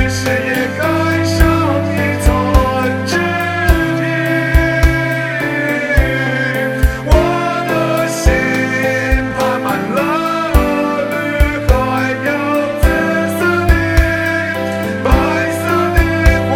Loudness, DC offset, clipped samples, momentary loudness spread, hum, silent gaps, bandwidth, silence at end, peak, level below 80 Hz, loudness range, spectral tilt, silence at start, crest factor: -14 LUFS; under 0.1%; 0.1%; 4 LU; none; none; 17.5 kHz; 0 s; 0 dBFS; -18 dBFS; 1 LU; -6 dB/octave; 0 s; 14 dB